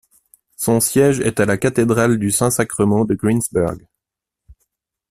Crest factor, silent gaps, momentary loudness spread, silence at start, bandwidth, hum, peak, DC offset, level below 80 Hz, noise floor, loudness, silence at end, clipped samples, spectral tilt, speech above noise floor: 16 dB; none; 6 LU; 0.6 s; 16 kHz; none; -2 dBFS; under 0.1%; -48 dBFS; -84 dBFS; -17 LUFS; 0.6 s; under 0.1%; -5.5 dB/octave; 68 dB